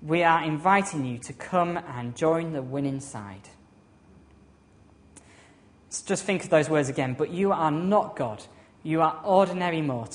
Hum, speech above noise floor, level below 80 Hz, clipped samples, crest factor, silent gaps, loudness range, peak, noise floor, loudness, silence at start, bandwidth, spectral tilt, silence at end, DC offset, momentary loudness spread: none; 31 dB; -62 dBFS; under 0.1%; 22 dB; none; 12 LU; -6 dBFS; -56 dBFS; -26 LUFS; 0 s; 10.5 kHz; -5.5 dB/octave; 0 s; under 0.1%; 13 LU